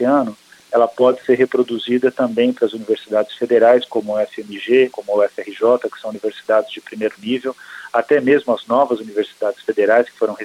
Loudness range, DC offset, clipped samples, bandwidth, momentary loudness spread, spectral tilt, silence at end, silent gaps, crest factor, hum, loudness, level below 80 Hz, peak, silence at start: 3 LU; under 0.1%; under 0.1%; 12.5 kHz; 10 LU; -5.5 dB/octave; 0 s; none; 14 dB; none; -17 LUFS; -68 dBFS; -2 dBFS; 0 s